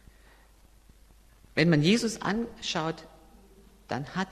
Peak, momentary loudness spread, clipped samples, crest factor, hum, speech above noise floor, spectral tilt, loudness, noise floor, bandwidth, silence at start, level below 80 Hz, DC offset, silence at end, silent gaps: -8 dBFS; 13 LU; under 0.1%; 22 dB; none; 30 dB; -5 dB/octave; -28 LUFS; -57 dBFS; 13.5 kHz; 1.55 s; -56 dBFS; under 0.1%; 0 s; none